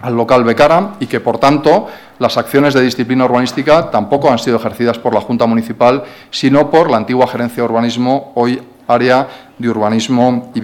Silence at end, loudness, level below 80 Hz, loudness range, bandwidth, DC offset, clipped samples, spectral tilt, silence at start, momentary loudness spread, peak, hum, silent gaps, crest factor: 0 s; -12 LUFS; -48 dBFS; 2 LU; 17 kHz; under 0.1%; 0.2%; -6 dB/octave; 0 s; 7 LU; 0 dBFS; none; none; 12 dB